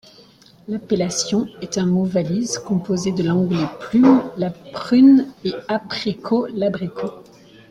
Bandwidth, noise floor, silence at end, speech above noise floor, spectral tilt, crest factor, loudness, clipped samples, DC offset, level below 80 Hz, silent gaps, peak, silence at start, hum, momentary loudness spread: 11 kHz; -49 dBFS; 0.5 s; 30 dB; -6 dB/octave; 16 dB; -19 LUFS; under 0.1%; under 0.1%; -56 dBFS; none; -2 dBFS; 0.7 s; none; 13 LU